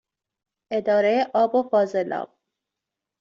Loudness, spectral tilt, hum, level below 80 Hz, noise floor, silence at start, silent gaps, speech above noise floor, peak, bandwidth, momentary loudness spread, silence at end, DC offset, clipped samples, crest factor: -22 LUFS; -6 dB/octave; none; -72 dBFS; -86 dBFS; 0.7 s; none; 64 dB; -8 dBFS; 7.4 kHz; 10 LU; 0.95 s; under 0.1%; under 0.1%; 16 dB